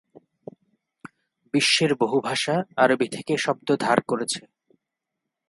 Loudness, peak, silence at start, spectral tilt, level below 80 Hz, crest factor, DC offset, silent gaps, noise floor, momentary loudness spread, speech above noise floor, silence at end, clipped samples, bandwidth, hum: -23 LUFS; 0 dBFS; 1.55 s; -3.5 dB/octave; -70 dBFS; 24 dB; under 0.1%; none; -83 dBFS; 7 LU; 61 dB; 1.1 s; under 0.1%; 11.5 kHz; none